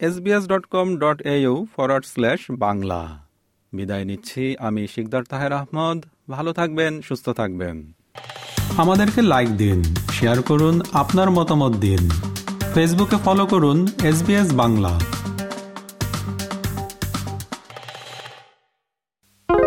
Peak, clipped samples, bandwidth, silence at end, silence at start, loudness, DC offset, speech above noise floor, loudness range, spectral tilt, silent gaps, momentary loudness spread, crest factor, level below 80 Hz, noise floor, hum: -4 dBFS; under 0.1%; 17 kHz; 0 s; 0 s; -20 LUFS; under 0.1%; 60 dB; 9 LU; -6 dB/octave; none; 16 LU; 16 dB; -42 dBFS; -79 dBFS; none